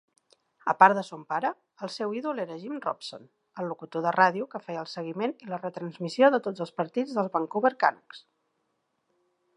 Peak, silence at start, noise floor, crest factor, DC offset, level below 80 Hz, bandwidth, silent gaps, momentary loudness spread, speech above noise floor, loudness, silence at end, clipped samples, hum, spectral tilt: -2 dBFS; 0.65 s; -77 dBFS; 26 dB; under 0.1%; -84 dBFS; 11 kHz; none; 14 LU; 49 dB; -28 LUFS; 1.4 s; under 0.1%; none; -6 dB/octave